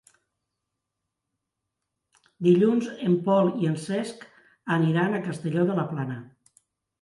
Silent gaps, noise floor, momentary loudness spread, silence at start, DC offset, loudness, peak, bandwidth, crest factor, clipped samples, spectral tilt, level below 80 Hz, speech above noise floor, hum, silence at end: none; -83 dBFS; 14 LU; 2.4 s; under 0.1%; -25 LUFS; -8 dBFS; 11.5 kHz; 18 dB; under 0.1%; -7.5 dB/octave; -72 dBFS; 60 dB; none; 0.75 s